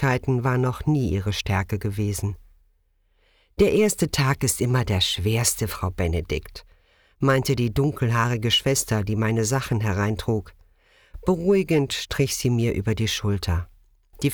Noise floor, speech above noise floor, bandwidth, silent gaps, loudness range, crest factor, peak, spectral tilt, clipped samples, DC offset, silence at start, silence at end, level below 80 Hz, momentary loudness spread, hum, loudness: -65 dBFS; 42 dB; over 20 kHz; none; 3 LU; 16 dB; -8 dBFS; -5 dB/octave; under 0.1%; under 0.1%; 0 s; 0 s; -40 dBFS; 7 LU; none; -23 LUFS